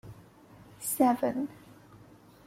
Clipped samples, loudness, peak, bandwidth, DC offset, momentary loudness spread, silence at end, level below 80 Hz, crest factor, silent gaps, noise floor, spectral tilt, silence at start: under 0.1%; -29 LUFS; -12 dBFS; 16.5 kHz; under 0.1%; 14 LU; 0.95 s; -66 dBFS; 22 dB; none; -55 dBFS; -5 dB/octave; 0.05 s